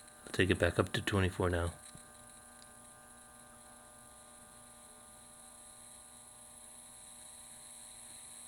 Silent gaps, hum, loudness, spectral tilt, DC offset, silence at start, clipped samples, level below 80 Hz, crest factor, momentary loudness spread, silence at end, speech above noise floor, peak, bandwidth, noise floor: none; 60 Hz at -70 dBFS; -35 LUFS; -5 dB/octave; under 0.1%; 0.2 s; under 0.1%; -58 dBFS; 28 dB; 22 LU; 0 s; 24 dB; -12 dBFS; 19.5 kHz; -57 dBFS